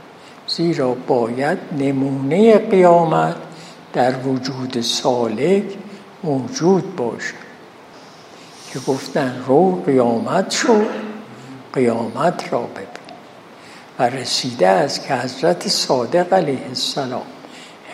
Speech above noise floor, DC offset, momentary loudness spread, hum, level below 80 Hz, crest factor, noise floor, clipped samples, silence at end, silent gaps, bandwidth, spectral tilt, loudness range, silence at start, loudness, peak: 24 dB; under 0.1%; 20 LU; none; -68 dBFS; 18 dB; -41 dBFS; under 0.1%; 0 s; none; 14.5 kHz; -5 dB/octave; 6 LU; 0.05 s; -18 LUFS; 0 dBFS